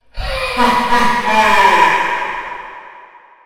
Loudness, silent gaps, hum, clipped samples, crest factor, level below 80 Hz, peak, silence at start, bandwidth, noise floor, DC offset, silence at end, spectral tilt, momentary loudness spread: -13 LUFS; none; none; under 0.1%; 14 dB; -34 dBFS; 0 dBFS; 0 s; 16.5 kHz; -41 dBFS; under 0.1%; 0 s; -3 dB/octave; 16 LU